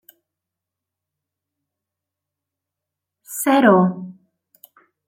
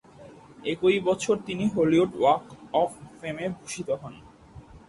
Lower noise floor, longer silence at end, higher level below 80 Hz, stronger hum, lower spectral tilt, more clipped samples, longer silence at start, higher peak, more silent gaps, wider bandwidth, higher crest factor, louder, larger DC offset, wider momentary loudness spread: first, -85 dBFS vs -49 dBFS; first, 0.95 s vs 0.1 s; second, -72 dBFS vs -58 dBFS; neither; about the same, -5.5 dB/octave vs -5.5 dB/octave; neither; first, 3.3 s vs 0.2 s; first, -2 dBFS vs -8 dBFS; neither; first, 16.5 kHz vs 11.5 kHz; about the same, 22 dB vs 18 dB; first, -16 LUFS vs -26 LUFS; neither; first, 21 LU vs 13 LU